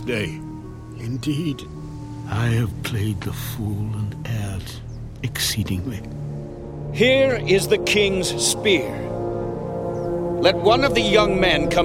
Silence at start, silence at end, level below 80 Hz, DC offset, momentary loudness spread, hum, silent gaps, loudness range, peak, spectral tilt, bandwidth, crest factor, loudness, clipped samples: 0 s; 0 s; -40 dBFS; under 0.1%; 17 LU; none; none; 7 LU; -2 dBFS; -4.5 dB/octave; 17 kHz; 20 dB; -21 LUFS; under 0.1%